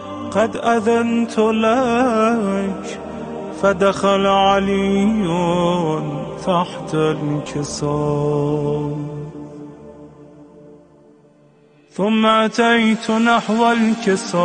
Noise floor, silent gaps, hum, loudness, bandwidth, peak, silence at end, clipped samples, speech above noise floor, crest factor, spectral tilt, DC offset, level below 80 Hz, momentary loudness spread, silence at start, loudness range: -51 dBFS; none; none; -17 LUFS; 9.8 kHz; -2 dBFS; 0 s; under 0.1%; 34 dB; 16 dB; -5.5 dB/octave; under 0.1%; -48 dBFS; 14 LU; 0 s; 8 LU